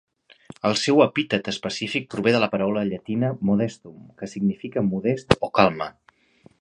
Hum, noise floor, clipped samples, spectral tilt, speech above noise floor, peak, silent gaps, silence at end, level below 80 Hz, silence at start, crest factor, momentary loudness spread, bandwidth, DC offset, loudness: none; -56 dBFS; under 0.1%; -5.5 dB/octave; 34 dB; 0 dBFS; none; 0.7 s; -52 dBFS; 0.65 s; 24 dB; 10 LU; 11 kHz; under 0.1%; -23 LUFS